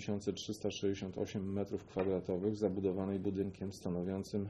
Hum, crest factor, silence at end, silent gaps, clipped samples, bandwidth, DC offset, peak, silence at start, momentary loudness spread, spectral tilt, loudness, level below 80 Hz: none; 18 dB; 0 s; none; under 0.1%; 12.5 kHz; under 0.1%; -20 dBFS; 0 s; 5 LU; -6.5 dB/octave; -38 LUFS; -66 dBFS